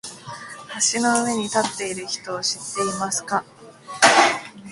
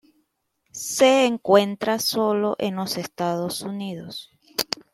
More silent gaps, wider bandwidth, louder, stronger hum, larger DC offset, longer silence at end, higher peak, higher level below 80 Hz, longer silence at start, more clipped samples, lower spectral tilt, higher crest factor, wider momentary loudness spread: neither; second, 11.5 kHz vs 16.5 kHz; about the same, -21 LUFS vs -22 LUFS; neither; neither; second, 0 s vs 0.3 s; about the same, 0 dBFS vs 0 dBFS; about the same, -64 dBFS vs -66 dBFS; second, 0.05 s vs 0.75 s; neither; second, -1.5 dB/octave vs -4 dB/octave; about the same, 22 dB vs 22 dB; first, 20 LU vs 15 LU